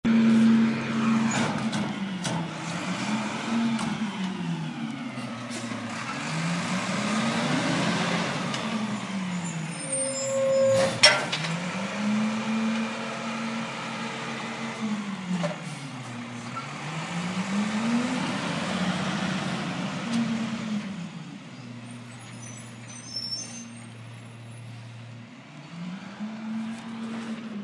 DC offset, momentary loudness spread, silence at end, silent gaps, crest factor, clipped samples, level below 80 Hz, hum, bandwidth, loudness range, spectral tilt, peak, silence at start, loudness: under 0.1%; 17 LU; 0 s; none; 26 dB; under 0.1%; -68 dBFS; none; 11.5 kHz; 13 LU; -4.5 dB/octave; -2 dBFS; 0.05 s; -28 LUFS